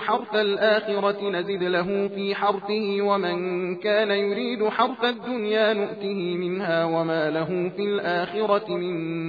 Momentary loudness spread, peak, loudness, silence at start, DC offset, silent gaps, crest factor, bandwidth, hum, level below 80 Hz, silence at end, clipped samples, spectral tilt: 5 LU; -8 dBFS; -24 LUFS; 0 s; under 0.1%; none; 16 dB; 5 kHz; none; -70 dBFS; 0 s; under 0.1%; -7.5 dB/octave